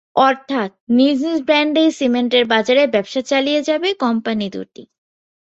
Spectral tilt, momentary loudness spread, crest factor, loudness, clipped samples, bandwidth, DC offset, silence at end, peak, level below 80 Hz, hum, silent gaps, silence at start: -4.5 dB/octave; 8 LU; 16 dB; -16 LUFS; under 0.1%; 8 kHz; under 0.1%; 0.6 s; 0 dBFS; -62 dBFS; none; 0.80-0.87 s; 0.15 s